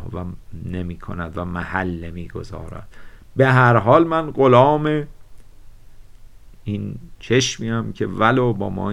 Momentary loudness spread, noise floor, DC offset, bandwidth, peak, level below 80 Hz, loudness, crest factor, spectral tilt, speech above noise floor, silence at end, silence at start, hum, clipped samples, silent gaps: 20 LU; -41 dBFS; under 0.1%; 11 kHz; 0 dBFS; -42 dBFS; -18 LUFS; 20 dB; -6 dB/octave; 22 dB; 0 s; 0 s; none; under 0.1%; none